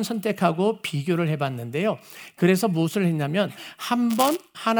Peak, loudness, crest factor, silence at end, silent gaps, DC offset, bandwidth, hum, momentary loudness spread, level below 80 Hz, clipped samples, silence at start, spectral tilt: -4 dBFS; -24 LUFS; 20 dB; 0 s; none; under 0.1%; over 20 kHz; none; 7 LU; -72 dBFS; under 0.1%; 0 s; -6 dB/octave